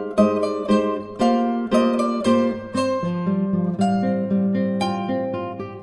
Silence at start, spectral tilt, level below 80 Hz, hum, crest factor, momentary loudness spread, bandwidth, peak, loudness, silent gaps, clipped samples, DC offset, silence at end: 0 s; -7 dB/octave; -54 dBFS; none; 16 dB; 5 LU; 11.5 kHz; -4 dBFS; -21 LUFS; none; under 0.1%; under 0.1%; 0 s